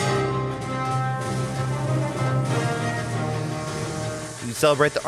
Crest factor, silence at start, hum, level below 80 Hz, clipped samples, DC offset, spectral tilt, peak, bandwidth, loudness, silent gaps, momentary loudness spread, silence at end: 18 dB; 0 s; none; -50 dBFS; under 0.1%; under 0.1%; -5.5 dB/octave; -6 dBFS; 14.5 kHz; -25 LUFS; none; 7 LU; 0 s